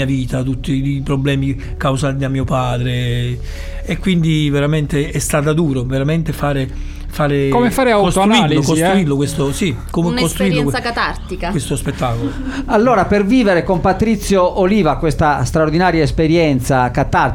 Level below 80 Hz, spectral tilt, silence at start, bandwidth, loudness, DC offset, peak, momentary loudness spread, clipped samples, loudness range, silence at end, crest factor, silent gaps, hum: -28 dBFS; -6 dB/octave; 0 s; 17 kHz; -15 LUFS; under 0.1%; -2 dBFS; 8 LU; under 0.1%; 4 LU; 0 s; 12 dB; none; none